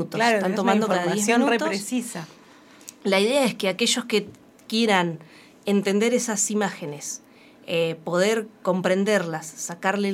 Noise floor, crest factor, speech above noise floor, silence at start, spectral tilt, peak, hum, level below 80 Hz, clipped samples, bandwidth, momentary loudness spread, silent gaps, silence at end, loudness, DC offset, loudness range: -50 dBFS; 20 dB; 27 dB; 0 s; -3.5 dB/octave; -4 dBFS; none; -74 dBFS; under 0.1%; 16 kHz; 13 LU; none; 0 s; -23 LUFS; under 0.1%; 2 LU